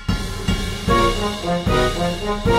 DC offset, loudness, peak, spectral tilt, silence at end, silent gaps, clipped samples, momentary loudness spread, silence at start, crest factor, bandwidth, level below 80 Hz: under 0.1%; -20 LUFS; -4 dBFS; -5 dB/octave; 0 s; none; under 0.1%; 6 LU; 0 s; 16 dB; 16 kHz; -28 dBFS